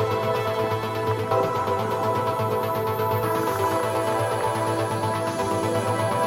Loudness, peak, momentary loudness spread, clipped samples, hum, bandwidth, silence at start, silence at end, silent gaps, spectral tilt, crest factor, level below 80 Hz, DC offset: -24 LUFS; -10 dBFS; 2 LU; under 0.1%; none; 17 kHz; 0 s; 0 s; none; -5.5 dB/octave; 14 dB; -56 dBFS; under 0.1%